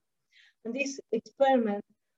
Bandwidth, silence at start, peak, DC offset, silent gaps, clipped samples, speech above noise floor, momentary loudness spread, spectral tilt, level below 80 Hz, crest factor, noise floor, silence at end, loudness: 8 kHz; 0.65 s; -14 dBFS; under 0.1%; none; under 0.1%; 35 dB; 13 LU; -4.5 dB/octave; -82 dBFS; 18 dB; -64 dBFS; 0.35 s; -30 LUFS